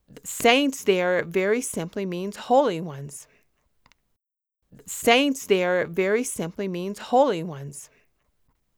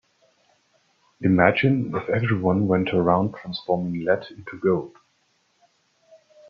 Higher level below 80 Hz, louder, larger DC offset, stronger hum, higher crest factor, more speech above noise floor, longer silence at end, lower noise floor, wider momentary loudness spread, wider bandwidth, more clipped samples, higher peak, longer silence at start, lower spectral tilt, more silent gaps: second, -64 dBFS vs -58 dBFS; about the same, -23 LUFS vs -22 LUFS; neither; neither; about the same, 20 dB vs 22 dB; first, 56 dB vs 45 dB; second, 0.9 s vs 1.6 s; first, -80 dBFS vs -67 dBFS; first, 16 LU vs 9 LU; first, over 20 kHz vs 6.4 kHz; neither; about the same, -4 dBFS vs -2 dBFS; second, 0.25 s vs 1.2 s; second, -4 dB/octave vs -9 dB/octave; neither